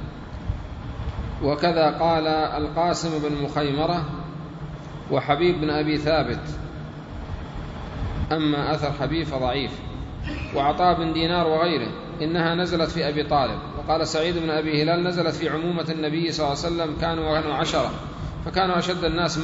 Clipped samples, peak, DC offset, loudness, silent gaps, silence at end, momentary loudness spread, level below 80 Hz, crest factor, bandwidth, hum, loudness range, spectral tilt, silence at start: under 0.1%; -6 dBFS; under 0.1%; -24 LUFS; none; 0 s; 14 LU; -38 dBFS; 18 dB; 8 kHz; none; 3 LU; -6 dB/octave; 0 s